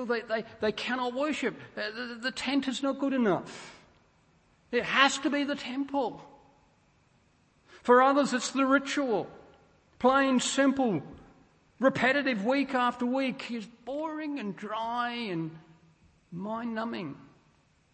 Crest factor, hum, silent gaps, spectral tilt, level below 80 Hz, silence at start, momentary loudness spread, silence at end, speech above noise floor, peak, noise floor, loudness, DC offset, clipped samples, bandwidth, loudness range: 24 dB; none; none; -4 dB/octave; -68 dBFS; 0 s; 14 LU; 0.7 s; 37 dB; -6 dBFS; -66 dBFS; -29 LUFS; under 0.1%; under 0.1%; 8.8 kHz; 8 LU